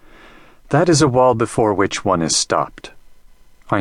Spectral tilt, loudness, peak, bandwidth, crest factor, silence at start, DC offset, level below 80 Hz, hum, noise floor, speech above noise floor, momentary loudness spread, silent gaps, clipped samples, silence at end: -4.5 dB/octave; -16 LUFS; 0 dBFS; 13 kHz; 18 dB; 0.7 s; under 0.1%; -46 dBFS; none; -45 dBFS; 29 dB; 7 LU; none; under 0.1%; 0 s